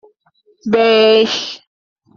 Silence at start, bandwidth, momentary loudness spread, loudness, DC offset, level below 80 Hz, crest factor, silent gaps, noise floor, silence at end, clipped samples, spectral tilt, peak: 0.65 s; 7.2 kHz; 18 LU; -12 LUFS; under 0.1%; -62 dBFS; 14 dB; none; -57 dBFS; 0.6 s; under 0.1%; -4 dB/octave; -2 dBFS